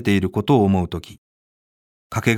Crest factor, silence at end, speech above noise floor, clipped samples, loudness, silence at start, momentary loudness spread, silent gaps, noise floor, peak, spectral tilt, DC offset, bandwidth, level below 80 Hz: 20 dB; 0 s; over 71 dB; under 0.1%; -20 LUFS; 0 s; 12 LU; 1.18-2.10 s; under -90 dBFS; -2 dBFS; -6.5 dB/octave; under 0.1%; 16 kHz; -46 dBFS